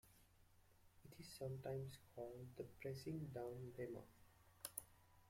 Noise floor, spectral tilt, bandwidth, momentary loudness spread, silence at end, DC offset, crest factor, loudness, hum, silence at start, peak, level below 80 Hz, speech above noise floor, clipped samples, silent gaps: -73 dBFS; -5.5 dB/octave; 16.5 kHz; 10 LU; 0 s; under 0.1%; 26 dB; -53 LUFS; none; 0.05 s; -28 dBFS; -76 dBFS; 21 dB; under 0.1%; none